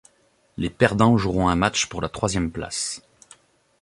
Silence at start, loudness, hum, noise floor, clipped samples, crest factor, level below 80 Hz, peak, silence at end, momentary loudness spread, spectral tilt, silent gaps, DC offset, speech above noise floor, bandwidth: 0.6 s; -22 LUFS; none; -62 dBFS; under 0.1%; 22 dB; -42 dBFS; -2 dBFS; 0.85 s; 12 LU; -4.5 dB/octave; none; under 0.1%; 41 dB; 11.5 kHz